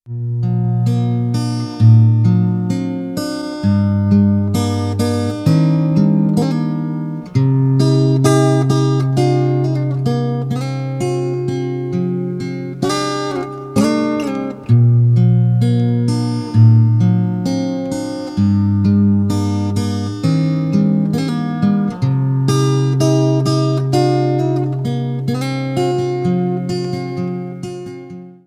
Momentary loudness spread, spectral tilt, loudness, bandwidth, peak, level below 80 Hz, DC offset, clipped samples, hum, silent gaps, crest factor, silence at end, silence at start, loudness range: 9 LU; -7.5 dB/octave; -16 LUFS; 12.5 kHz; 0 dBFS; -50 dBFS; under 0.1%; under 0.1%; none; none; 14 dB; 0.15 s; 0.05 s; 5 LU